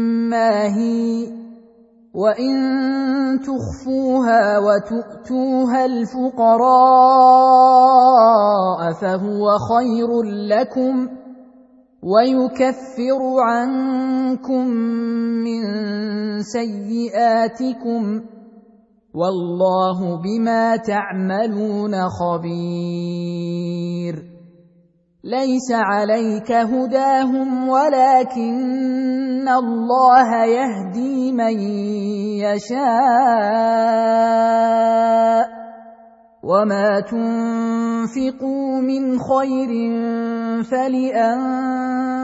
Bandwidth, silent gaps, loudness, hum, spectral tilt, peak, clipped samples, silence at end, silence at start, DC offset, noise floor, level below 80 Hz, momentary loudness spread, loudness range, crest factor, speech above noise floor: 8 kHz; none; -17 LUFS; none; -6.5 dB/octave; 0 dBFS; under 0.1%; 0 s; 0 s; under 0.1%; -56 dBFS; -58 dBFS; 12 LU; 9 LU; 16 dB; 40 dB